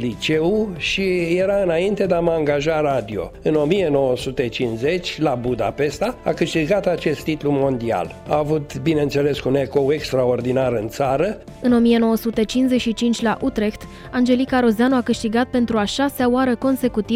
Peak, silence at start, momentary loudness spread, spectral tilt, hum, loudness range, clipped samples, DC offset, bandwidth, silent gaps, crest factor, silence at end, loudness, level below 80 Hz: -6 dBFS; 0 s; 5 LU; -6 dB/octave; none; 2 LU; under 0.1%; under 0.1%; 16 kHz; none; 14 dB; 0 s; -20 LUFS; -44 dBFS